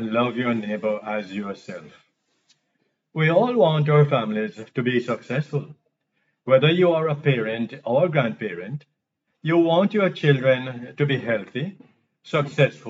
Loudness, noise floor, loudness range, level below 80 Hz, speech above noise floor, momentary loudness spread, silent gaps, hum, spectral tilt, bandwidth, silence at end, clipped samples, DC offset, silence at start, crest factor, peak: -22 LUFS; -77 dBFS; 2 LU; -80 dBFS; 55 dB; 15 LU; none; none; -8 dB/octave; 7.6 kHz; 0 s; under 0.1%; under 0.1%; 0 s; 20 dB; -4 dBFS